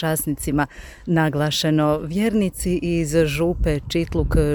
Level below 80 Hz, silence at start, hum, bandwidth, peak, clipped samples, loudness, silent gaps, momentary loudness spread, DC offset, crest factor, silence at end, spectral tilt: -30 dBFS; 0 s; none; over 20 kHz; -6 dBFS; under 0.1%; -21 LUFS; none; 4 LU; under 0.1%; 16 dB; 0 s; -5.5 dB/octave